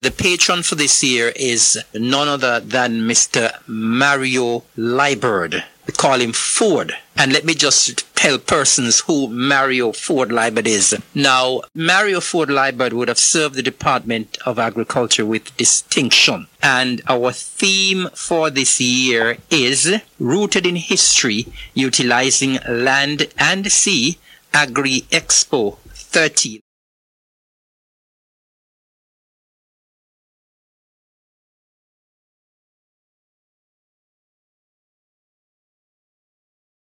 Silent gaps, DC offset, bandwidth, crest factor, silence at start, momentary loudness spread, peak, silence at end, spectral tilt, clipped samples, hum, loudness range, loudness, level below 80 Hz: none; under 0.1%; 16.5 kHz; 18 dB; 0.05 s; 8 LU; 0 dBFS; 10.4 s; -2 dB/octave; under 0.1%; none; 3 LU; -15 LUFS; -52 dBFS